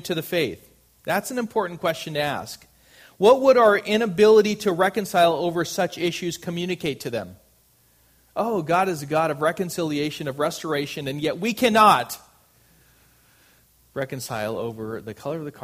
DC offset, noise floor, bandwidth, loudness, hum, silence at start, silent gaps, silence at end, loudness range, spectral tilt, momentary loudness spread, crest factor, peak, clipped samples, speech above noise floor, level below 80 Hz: under 0.1%; -60 dBFS; 15.5 kHz; -22 LUFS; none; 0.05 s; none; 0 s; 9 LU; -4.5 dB/octave; 16 LU; 20 dB; -2 dBFS; under 0.1%; 38 dB; -62 dBFS